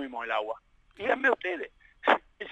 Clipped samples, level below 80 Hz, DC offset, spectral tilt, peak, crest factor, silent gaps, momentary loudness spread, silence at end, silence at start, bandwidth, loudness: under 0.1%; -66 dBFS; under 0.1%; -4 dB/octave; -6 dBFS; 24 dB; none; 13 LU; 0 s; 0 s; 9.2 kHz; -29 LUFS